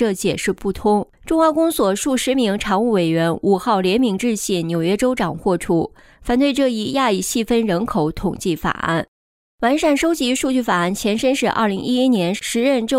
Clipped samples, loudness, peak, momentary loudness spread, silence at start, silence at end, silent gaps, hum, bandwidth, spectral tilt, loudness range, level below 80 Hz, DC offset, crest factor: under 0.1%; -18 LUFS; -6 dBFS; 5 LU; 0 s; 0 s; 9.08-9.58 s; none; 16 kHz; -4.5 dB/octave; 2 LU; -44 dBFS; under 0.1%; 12 dB